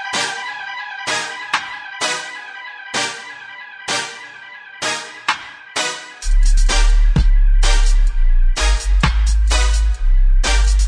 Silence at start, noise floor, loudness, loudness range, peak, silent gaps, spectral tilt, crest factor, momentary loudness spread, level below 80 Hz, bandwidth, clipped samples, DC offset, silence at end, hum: 0 s; -36 dBFS; -19 LUFS; 6 LU; -2 dBFS; none; -3 dB/octave; 14 dB; 13 LU; -16 dBFS; 10.5 kHz; under 0.1%; under 0.1%; 0 s; none